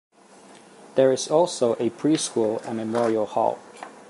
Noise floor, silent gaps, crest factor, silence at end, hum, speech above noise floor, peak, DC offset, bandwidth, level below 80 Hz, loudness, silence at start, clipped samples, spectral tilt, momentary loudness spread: -50 dBFS; none; 18 dB; 0.1 s; none; 27 dB; -6 dBFS; under 0.1%; 11.5 kHz; -74 dBFS; -23 LUFS; 0.85 s; under 0.1%; -4.5 dB/octave; 7 LU